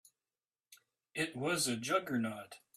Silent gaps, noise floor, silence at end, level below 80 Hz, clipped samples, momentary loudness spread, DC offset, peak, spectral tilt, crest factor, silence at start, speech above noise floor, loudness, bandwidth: none; under -90 dBFS; 0.2 s; -78 dBFS; under 0.1%; 10 LU; under 0.1%; -20 dBFS; -3.5 dB/octave; 20 dB; 0.7 s; over 53 dB; -36 LUFS; 15.5 kHz